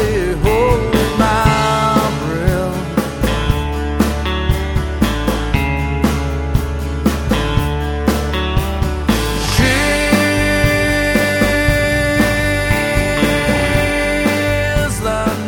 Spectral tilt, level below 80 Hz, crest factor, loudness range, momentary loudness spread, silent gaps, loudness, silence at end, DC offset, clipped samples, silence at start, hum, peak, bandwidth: -5 dB/octave; -22 dBFS; 14 dB; 4 LU; 5 LU; none; -15 LUFS; 0 s; under 0.1%; under 0.1%; 0 s; none; 0 dBFS; over 20 kHz